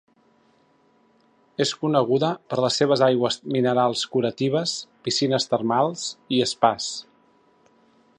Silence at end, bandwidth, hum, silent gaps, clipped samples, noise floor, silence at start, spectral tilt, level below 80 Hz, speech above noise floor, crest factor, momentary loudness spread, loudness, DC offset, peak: 1.15 s; 11 kHz; none; none; under 0.1%; -61 dBFS; 1.6 s; -4.5 dB/octave; -68 dBFS; 39 dB; 22 dB; 8 LU; -22 LUFS; under 0.1%; -2 dBFS